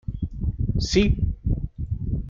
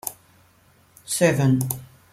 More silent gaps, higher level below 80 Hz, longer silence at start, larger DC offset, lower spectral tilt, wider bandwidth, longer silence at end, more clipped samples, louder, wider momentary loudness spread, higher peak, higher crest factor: neither; first, -28 dBFS vs -58 dBFS; about the same, 0.1 s vs 0.05 s; neither; about the same, -6 dB/octave vs -5.5 dB/octave; second, 7.6 kHz vs 16.5 kHz; second, 0 s vs 0.3 s; neither; second, -25 LUFS vs -22 LUFS; second, 10 LU vs 13 LU; about the same, -6 dBFS vs -4 dBFS; about the same, 18 dB vs 20 dB